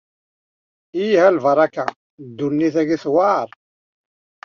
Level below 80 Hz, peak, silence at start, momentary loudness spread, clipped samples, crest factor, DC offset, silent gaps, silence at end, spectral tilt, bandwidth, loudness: -66 dBFS; -2 dBFS; 0.95 s; 14 LU; under 0.1%; 18 dB; under 0.1%; 1.96-2.18 s; 1 s; -5 dB/octave; 7 kHz; -18 LUFS